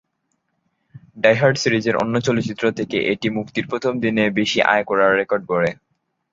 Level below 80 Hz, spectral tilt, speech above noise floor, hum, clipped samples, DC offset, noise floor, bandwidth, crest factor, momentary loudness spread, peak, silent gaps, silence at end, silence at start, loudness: -56 dBFS; -5 dB/octave; 53 dB; none; under 0.1%; under 0.1%; -72 dBFS; 7.8 kHz; 18 dB; 6 LU; -2 dBFS; none; 0.6 s; 0.95 s; -19 LUFS